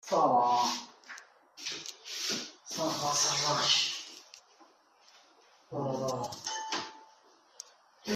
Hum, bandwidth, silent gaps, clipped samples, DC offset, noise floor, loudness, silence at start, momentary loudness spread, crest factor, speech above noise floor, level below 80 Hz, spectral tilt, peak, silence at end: none; 15.5 kHz; none; under 0.1%; under 0.1%; -63 dBFS; -31 LUFS; 0.05 s; 23 LU; 20 dB; 34 dB; -76 dBFS; -2 dB/octave; -14 dBFS; 0 s